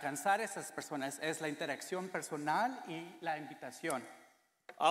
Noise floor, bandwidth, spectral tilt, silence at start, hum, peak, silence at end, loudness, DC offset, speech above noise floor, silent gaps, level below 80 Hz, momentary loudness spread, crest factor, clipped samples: -60 dBFS; 16 kHz; -3 dB/octave; 0 s; none; -18 dBFS; 0 s; -39 LUFS; under 0.1%; 21 dB; none; -88 dBFS; 10 LU; 20 dB; under 0.1%